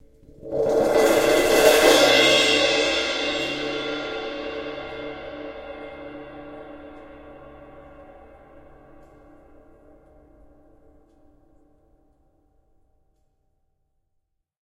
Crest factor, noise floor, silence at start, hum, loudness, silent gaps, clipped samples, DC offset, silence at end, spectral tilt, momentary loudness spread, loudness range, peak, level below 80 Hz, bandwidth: 24 dB; -75 dBFS; 0.45 s; none; -19 LUFS; none; under 0.1%; under 0.1%; 6.55 s; -2 dB/octave; 25 LU; 25 LU; 0 dBFS; -52 dBFS; 16 kHz